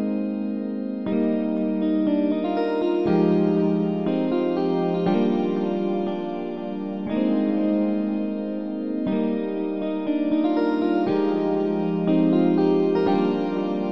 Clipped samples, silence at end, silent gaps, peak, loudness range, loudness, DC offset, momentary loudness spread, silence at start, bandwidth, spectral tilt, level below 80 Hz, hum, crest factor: under 0.1%; 0 s; none; -8 dBFS; 3 LU; -23 LUFS; 0.4%; 8 LU; 0 s; 6 kHz; -10 dB/octave; -66 dBFS; none; 14 dB